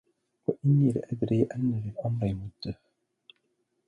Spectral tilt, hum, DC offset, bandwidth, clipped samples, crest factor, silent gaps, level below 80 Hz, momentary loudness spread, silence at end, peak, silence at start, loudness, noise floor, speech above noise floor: -9.5 dB/octave; none; under 0.1%; 9.8 kHz; under 0.1%; 18 dB; none; -56 dBFS; 15 LU; 1.15 s; -12 dBFS; 0.5 s; -29 LUFS; -76 dBFS; 49 dB